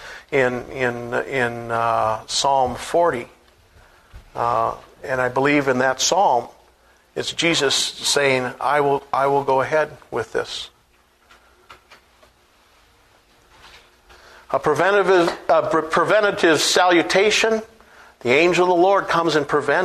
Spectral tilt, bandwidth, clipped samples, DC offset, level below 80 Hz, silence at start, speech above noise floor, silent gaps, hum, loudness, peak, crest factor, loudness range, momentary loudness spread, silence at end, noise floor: -3 dB/octave; 13.5 kHz; under 0.1%; under 0.1%; -54 dBFS; 0 s; 39 dB; none; none; -19 LUFS; -2 dBFS; 18 dB; 8 LU; 10 LU; 0 s; -58 dBFS